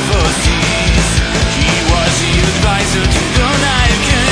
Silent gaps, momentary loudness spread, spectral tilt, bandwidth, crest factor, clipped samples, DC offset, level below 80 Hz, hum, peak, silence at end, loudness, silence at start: none; 2 LU; -3.5 dB/octave; 10.5 kHz; 12 dB; under 0.1%; under 0.1%; -18 dBFS; none; 0 dBFS; 0 s; -12 LUFS; 0 s